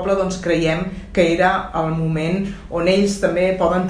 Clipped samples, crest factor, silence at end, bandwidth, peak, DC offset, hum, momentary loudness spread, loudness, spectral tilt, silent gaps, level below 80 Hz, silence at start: under 0.1%; 16 dB; 0 s; 11 kHz; -2 dBFS; under 0.1%; none; 6 LU; -19 LUFS; -6 dB/octave; none; -38 dBFS; 0 s